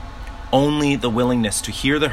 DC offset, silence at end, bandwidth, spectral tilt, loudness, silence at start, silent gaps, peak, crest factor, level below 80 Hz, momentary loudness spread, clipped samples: under 0.1%; 0 s; 15.5 kHz; -4.5 dB/octave; -19 LUFS; 0 s; none; -2 dBFS; 18 dB; -36 dBFS; 8 LU; under 0.1%